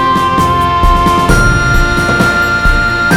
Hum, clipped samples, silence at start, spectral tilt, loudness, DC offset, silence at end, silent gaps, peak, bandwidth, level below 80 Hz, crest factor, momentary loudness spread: none; 0.2%; 0 s; -5 dB/octave; -10 LUFS; 1%; 0 s; none; 0 dBFS; 17 kHz; -16 dBFS; 10 dB; 2 LU